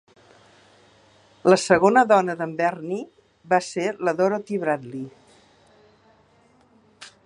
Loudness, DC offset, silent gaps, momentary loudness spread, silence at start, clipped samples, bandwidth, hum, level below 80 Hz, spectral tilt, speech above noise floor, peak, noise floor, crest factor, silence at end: -21 LUFS; under 0.1%; none; 16 LU; 1.45 s; under 0.1%; 11.5 kHz; none; -66 dBFS; -5 dB/octave; 37 dB; -2 dBFS; -58 dBFS; 22 dB; 0.15 s